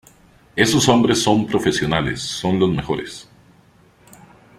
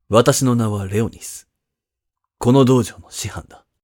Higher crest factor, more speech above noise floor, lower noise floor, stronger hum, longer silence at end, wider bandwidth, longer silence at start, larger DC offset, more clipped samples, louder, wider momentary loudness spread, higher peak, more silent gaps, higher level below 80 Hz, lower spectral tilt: about the same, 18 dB vs 18 dB; second, 34 dB vs 65 dB; second, -52 dBFS vs -82 dBFS; neither; first, 1.35 s vs 0.4 s; second, 15.5 kHz vs 17.5 kHz; first, 0.55 s vs 0.1 s; neither; neither; about the same, -18 LUFS vs -17 LUFS; second, 12 LU vs 19 LU; about the same, -2 dBFS vs 0 dBFS; neither; about the same, -46 dBFS vs -48 dBFS; about the same, -4.5 dB/octave vs -5.5 dB/octave